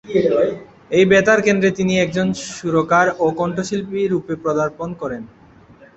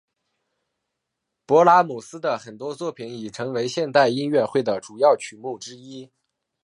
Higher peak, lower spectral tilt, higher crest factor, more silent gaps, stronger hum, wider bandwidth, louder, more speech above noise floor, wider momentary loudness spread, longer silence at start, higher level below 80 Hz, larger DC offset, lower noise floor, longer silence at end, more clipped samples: about the same, 0 dBFS vs -2 dBFS; about the same, -5.5 dB/octave vs -5 dB/octave; about the same, 18 dB vs 20 dB; neither; neither; second, 8.2 kHz vs 11 kHz; first, -18 LUFS vs -21 LUFS; second, 29 dB vs 59 dB; second, 13 LU vs 18 LU; second, 0.05 s vs 1.5 s; first, -52 dBFS vs -74 dBFS; neither; second, -46 dBFS vs -81 dBFS; second, 0.1 s vs 0.6 s; neither